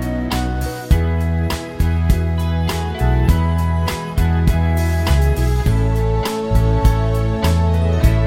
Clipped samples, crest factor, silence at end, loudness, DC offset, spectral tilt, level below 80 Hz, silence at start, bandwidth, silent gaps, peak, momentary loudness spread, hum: under 0.1%; 14 dB; 0 s; -18 LUFS; 0.2%; -6.5 dB/octave; -20 dBFS; 0 s; 17 kHz; none; -2 dBFS; 5 LU; none